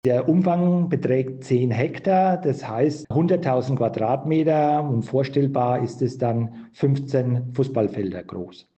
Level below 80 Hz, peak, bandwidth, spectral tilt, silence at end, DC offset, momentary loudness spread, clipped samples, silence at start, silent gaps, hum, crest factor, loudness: -62 dBFS; -8 dBFS; 8.4 kHz; -9 dB/octave; 0.25 s; under 0.1%; 6 LU; under 0.1%; 0.05 s; none; none; 12 dB; -22 LUFS